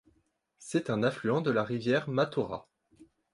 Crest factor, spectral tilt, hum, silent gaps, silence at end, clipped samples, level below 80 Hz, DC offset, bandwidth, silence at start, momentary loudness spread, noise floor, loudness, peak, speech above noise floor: 18 dB; -6.5 dB/octave; none; none; 0.3 s; under 0.1%; -68 dBFS; under 0.1%; 11.5 kHz; 0.6 s; 9 LU; -73 dBFS; -30 LUFS; -14 dBFS; 43 dB